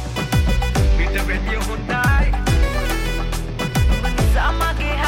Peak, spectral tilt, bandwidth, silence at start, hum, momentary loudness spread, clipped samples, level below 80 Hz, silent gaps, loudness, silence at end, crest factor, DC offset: -6 dBFS; -5 dB/octave; 16.5 kHz; 0 s; none; 5 LU; under 0.1%; -20 dBFS; none; -20 LUFS; 0 s; 10 dB; under 0.1%